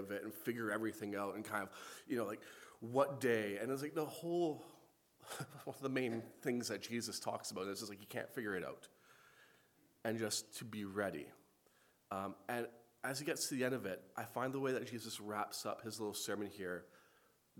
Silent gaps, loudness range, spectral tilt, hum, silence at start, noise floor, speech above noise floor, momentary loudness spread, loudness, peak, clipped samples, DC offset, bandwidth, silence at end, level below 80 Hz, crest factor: none; 5 LU; -4 dB/octave; none; 0 s; -73 dBFS; 31 dB; 11 LU; -42 LUFS; -20 dBFS; under 0.1%; under 0.1%; 19 kHz; 0.6 s; -86 dBFS; 24 dB